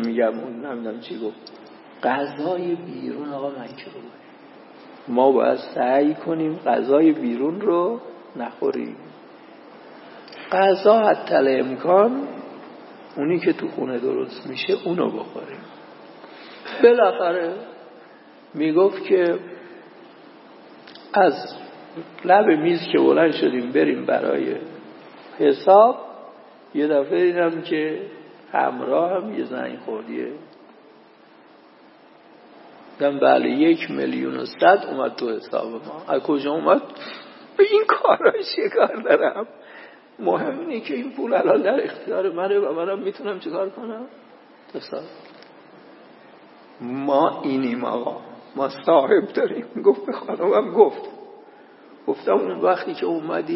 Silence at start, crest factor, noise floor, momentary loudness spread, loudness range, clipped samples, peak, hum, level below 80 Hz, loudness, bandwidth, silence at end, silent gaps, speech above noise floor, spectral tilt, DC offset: 0 s; 20 dB; -50 dBFS; 21 LU; 8 LU; under 0.1%; 0 dBFS; none; -80 dBFS; -21 LUFS; 5.8 kHz; 0 s; none; 30 dB; -10 dB/octave; under 0.1%